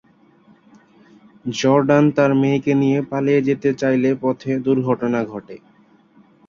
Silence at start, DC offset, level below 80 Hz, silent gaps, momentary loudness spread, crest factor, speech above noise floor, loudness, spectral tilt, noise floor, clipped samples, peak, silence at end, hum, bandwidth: 1.45 s; under 0.1%; -60 dBFS; none; 9 LU; 16 dB; 35 dB; -18 LUFS; -7 dB/octave; -52 dBFS; under 0.1%; -2 dBFS; 0.9 s; none; 7.2 kHz